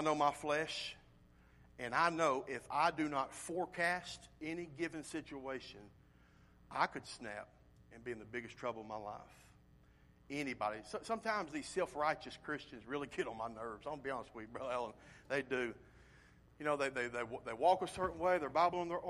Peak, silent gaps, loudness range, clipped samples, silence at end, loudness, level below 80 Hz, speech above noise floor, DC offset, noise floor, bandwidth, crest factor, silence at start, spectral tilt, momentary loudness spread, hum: -18 dBFS; none; 8 LU; under 0.1%; 0 s; -40 LUFS; -68 dBFS; 26 dB; under 0.1%; -66 dBFS; 13 kHz; 22 dB; 0 s; -4 dB/octave; 13 LU; none